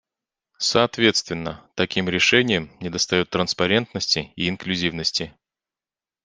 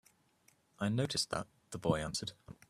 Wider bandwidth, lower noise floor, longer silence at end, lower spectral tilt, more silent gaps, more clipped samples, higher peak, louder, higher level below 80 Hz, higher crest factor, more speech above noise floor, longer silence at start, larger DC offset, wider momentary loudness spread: second, 10 kHz vs 14.5 kHz; first, under -90 dBFS vs -71 dBFS; first, 0.95 s vs 0.2 s; about the same, -3.5 dB/octave vs -4.5 dB/octave; neither; neither; first, -2 dBFS vs -18 dBFS; first, -21 LUFS vs -37 LUFS; first, -56 dBFS vs -62 dBFS; about the same, 22 dB vs 20 dB; first, over 68 dB vs 34 dB; second, 0.6 s vs 0.8 s; neither; about the same, 10 LU vs 9 LU